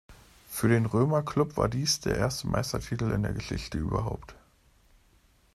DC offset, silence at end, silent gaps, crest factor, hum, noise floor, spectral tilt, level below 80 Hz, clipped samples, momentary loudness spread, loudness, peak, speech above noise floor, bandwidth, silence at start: under 0.1%; 1.2 s; none; 18 dB; none; -63 dBFS; -5.5 dB/octave; -46 dBFS; under 0.1%; 9 LU; -29 LUFS; -12 dBFS; 35 dB; 14 kHz; 0.1 s